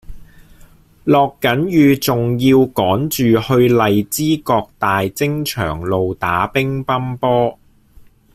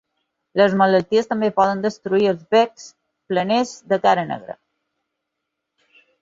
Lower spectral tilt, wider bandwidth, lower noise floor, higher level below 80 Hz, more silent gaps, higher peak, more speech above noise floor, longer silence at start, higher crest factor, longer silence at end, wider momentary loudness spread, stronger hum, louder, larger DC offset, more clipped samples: about the same, -6 dB/octave vs -5.5 dB/octave; first, 16 kHz vs 7.8 kHz; second, -45 dBFS vs -79 dBFS; first, -44 dBFS vs -64 dBFS; neither; about the same, -2 dBFS vs -2 dBFS; second, 30 dB vs 61 dB; second, 0.1 s vs 0.55 s; about the same, 14 dB vs 18 dB; second, 0.3 s vs 1.7 s; second, 7 LU vs 11 LU; neither; first, -16 LUFS vs -19 LUFS; neither; neither